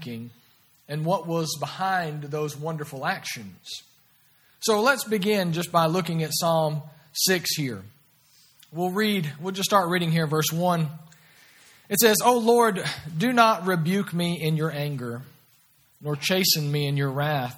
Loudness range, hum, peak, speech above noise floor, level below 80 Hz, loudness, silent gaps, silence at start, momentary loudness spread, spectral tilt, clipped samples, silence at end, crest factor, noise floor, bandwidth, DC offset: 7 LU; none; -2 dBFS; 36 dB; -68 dBFS; -24 LUFS; none; 0 s; 16 LU; -4.5 dB/octave; under 0.1%; 0 s; 22 dB; -61 dBFS; 18 kHz; under 0.1%